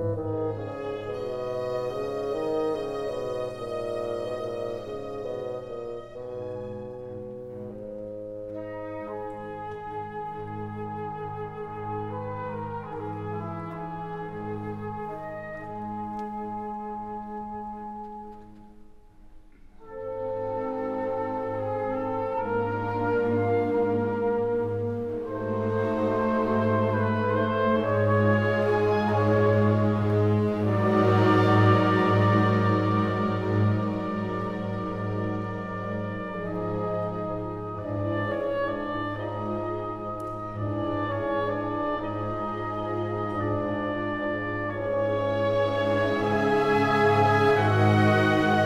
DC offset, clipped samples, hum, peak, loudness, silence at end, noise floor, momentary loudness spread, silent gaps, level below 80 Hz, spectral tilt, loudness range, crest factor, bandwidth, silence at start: under 0.1%; under 0.1%; none; -6 dBFS; -27 LUFS; 0 s; -49 dBFS; 15 LU; none; -52 dBFS; -8 dB/octave; 14 LU; 20 dB; 8 kHz; 0 s